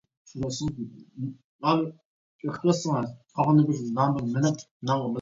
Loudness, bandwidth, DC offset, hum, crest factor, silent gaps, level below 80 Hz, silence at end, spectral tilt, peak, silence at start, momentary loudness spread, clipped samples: -27 LUFS; 7.8 kHz; under 0.1%; none; 18 dB; 1.44-1.59 s, 2.05-2.39 s, 4.71-4.80 s; -60 dBFS; 0 s; -6.5 dB/octave; -8 dBFS; 0.35 s; 15 LU; under 0.1%